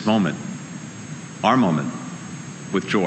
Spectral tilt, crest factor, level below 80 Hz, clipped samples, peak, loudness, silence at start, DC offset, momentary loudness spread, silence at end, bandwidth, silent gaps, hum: -5.5 dB/octave; 20 dB; -64 dBFS; under 0.1%; -2 dBFS; -23 LUFS; 0 s; under 0.1%; 16 LU; 0 s; 9.8 kHz; none; none